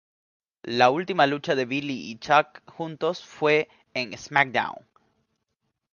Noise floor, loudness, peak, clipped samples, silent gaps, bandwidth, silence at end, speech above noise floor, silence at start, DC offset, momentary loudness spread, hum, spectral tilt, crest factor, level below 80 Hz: -79 dBFS; -24 LUFS; -2 dBFS; under 0.1%; none; 7.2 kHz; 1.2 s; 54 dB; 0.65 s; under 0.1%; 14 LU; none; -5 dB/octave; 24 dB; -70 dBFS